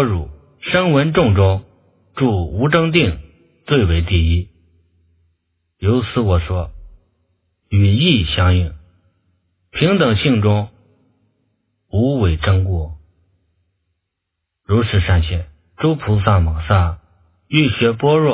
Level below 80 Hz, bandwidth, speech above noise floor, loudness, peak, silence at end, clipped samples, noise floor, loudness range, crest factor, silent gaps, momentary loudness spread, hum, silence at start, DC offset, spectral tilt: -26 dBFS; 4 kHz; 63 dB; -16 LUFS; 0 dBFS; 0 s; under 0.1%; -77 dBFS; 5 LU; 18 dB; none; 11 LU; none; 0 s; under 0.1%; -11 dB/octave